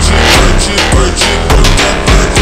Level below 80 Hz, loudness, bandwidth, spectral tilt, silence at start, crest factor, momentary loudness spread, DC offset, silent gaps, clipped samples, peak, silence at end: -10 dBFS; -8 LUFS; 16 kHz; -3.5 dB/octave; 0 s; 8 dB; 3 LU; under 0.1%; none; 0.5%; 0 dBFS; 0 s